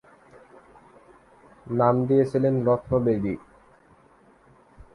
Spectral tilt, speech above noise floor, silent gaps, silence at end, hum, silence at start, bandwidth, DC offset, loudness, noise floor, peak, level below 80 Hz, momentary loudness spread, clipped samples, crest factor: -10 dB/octave; 35 dB; none; 1.55 s; none; 1.65 s; 11 kHz; under 0.1%; -23 LUFS; -57 dBFS; -6 dBFS; -54 dBFS; 10 LU; under 0.1%; 20 dB